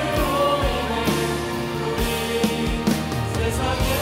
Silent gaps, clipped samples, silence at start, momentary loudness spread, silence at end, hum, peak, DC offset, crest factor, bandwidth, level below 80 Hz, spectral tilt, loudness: none; under 0.1%; 0 s; 5 LU; 0 s; none; -8 dBFS; under 0.1%; 14 dB; 16 kHz; -32 dBFS; -5 dB/octave; -22 LUFS